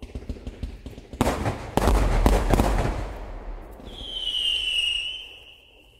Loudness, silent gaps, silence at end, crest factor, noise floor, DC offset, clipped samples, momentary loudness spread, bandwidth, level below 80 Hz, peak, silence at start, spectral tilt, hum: -24 LUFS; none; 0.45 s; 24 dB; -52 dBFS; under 0.1%; under 0.1%; 19 LU; 16 kHz; -28 dBFS; -2 dBFS; 0 s; -4.5 dB/octave; none